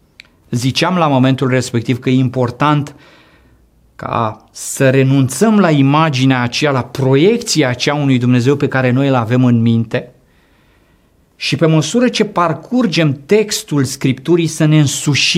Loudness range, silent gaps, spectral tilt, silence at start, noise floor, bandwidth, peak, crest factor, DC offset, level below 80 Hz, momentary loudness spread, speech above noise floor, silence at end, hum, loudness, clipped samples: 4 LU; none; -5.5 dB/octave; 0.5 s; -52 dBFS; 15.5 kHz; 0 dBFS; 12 dB; under 0.1%; -52 dBFS; 7 LU; 40 dB; 0 s; none; -13 LUFS; under 0.1%